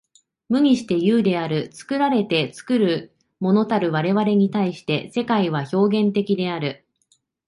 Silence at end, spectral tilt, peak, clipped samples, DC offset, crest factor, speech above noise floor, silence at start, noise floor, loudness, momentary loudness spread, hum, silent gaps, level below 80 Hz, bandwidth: 0.75 s; -7 dB/octave; -6 dBFS; under 0.1%; under 0.1%; 14 dB; 45 dB; 0.5 s; -65 dBFS; -21 LUFS; 8 LU; none; none; -64 dBFS; 11.5 kHz